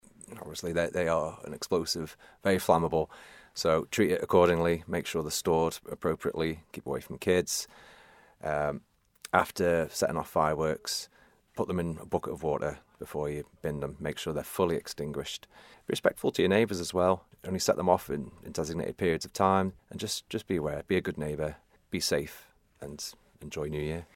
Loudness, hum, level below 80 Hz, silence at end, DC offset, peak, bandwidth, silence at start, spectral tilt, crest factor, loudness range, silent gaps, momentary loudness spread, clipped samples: -30 LUFS; none; -54 dBFS; 0.1 s; under 0.1%; -6 dBFS; 16.5 kHz; 0.3 s; -4.5 dB/octave; 24 dB; 6 LU; none; 14 LU; under 0.1%